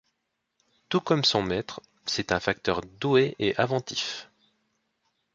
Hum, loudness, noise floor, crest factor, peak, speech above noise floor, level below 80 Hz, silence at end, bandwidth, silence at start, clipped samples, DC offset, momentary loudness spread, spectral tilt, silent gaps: none; -26 LUFS; -80 dBFS; 22 dB; -8 dBFS; 53 dB; -56 dBFS; 1.1 s; 7.8 kHz; 0.9 s; under 0.1%; under 0.1%; 10 LU; -4.5 dB/octave; none